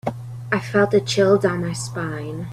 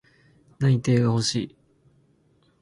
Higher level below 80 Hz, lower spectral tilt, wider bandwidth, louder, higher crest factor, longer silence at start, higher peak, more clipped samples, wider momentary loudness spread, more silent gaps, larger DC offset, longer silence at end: first, -52 dBFS vs -58 dBFS; about the same, -5.5 dB/octave vs -6 dB/octave; first, 13 kHz vs 11.5 kHz; first, -20 LUFS vs -23 LUFS; about the same, 16 dB vs 16 dB; second, 0.05 s vs 0.6 s; first, -4 dBFS vs -10 dBFS; neither; first, 12 LU vs 9 LU; neither; neither; second, 0 s vs 1.15 s